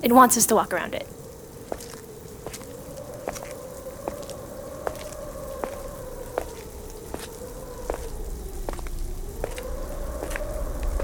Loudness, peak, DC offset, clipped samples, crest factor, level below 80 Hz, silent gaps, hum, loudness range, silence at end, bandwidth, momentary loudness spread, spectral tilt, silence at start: -28 LUFS; -2 dBFS; under 0.1%; under 0.1%; 26 dB; -36 dBFS; none; none; 8 LU; 0 s; over 20 kHz; 15 LU; -3.5 dB/octave; 0 s